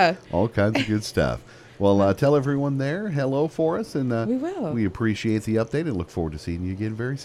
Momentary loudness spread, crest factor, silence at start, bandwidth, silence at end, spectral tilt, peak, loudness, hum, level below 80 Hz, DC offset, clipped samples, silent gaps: 9 LU; 18 dB; 0 s; 14 kHz; 0 s; -7 dB/octave; -6 dBFS; -24 LUFS; none; -46 dBFS; under 0.1%; under 0.1%; none